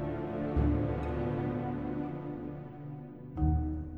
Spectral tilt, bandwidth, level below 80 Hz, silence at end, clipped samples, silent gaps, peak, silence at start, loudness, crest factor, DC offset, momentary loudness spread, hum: -11 dB/octave; 4.3 kHz; -40 dBFS; 0 s; under 0.1%; none; -16 dBFS; 0 s; -34 LUFS; 18 dB; 0.1%; 14 LU; none